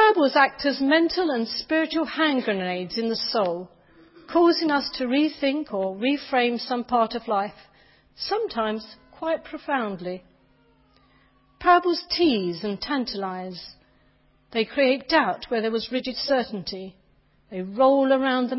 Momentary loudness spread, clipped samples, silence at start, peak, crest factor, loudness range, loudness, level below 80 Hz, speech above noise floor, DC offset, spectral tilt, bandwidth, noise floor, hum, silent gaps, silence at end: 14 LU; under 0.1%; 0 s; -4 dBFS; 20 dB; 6 LU; -24 LUFS; -60 dBFS; 37 dB; under 0.1%; -8 dB/octave; 5.8 kHz; -61 dBFS; none; none; 0 s